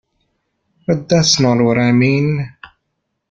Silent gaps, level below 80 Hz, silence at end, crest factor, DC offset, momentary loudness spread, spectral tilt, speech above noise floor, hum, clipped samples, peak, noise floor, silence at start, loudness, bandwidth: none; -50 dBFS; 0.65 s; 16 dB; under 0.1%; 11 LU; -5 dB/octave; 59 dB; none; under 0.1%; -2 dBFS; -72 dBFS; 0.9 s; -14 LUFS; 9 kHz